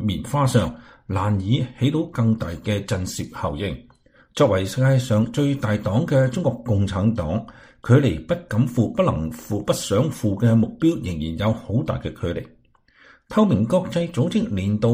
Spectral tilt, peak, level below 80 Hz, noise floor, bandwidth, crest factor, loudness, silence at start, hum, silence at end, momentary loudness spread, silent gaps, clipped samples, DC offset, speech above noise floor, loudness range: -7 dB/octave; -2 dBFS; -44 dBFS; -56 dBFS; 15.5 kHz; 18 dB; -22 LUFS; 0 s; none; 0 s; 10 LU; none; under 0.1%; under 0.1%; 35 dB; 3 LU